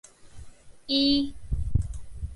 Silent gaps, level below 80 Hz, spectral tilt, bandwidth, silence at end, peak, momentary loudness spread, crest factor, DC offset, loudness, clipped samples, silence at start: none; -36 dBFS; -6 dB/octave; 11.5 kHz; 0 s; -10 dBFS; 16 LU; 18 dB; under 0.1%; -27 LUFS; under 0.1%; 0.25 s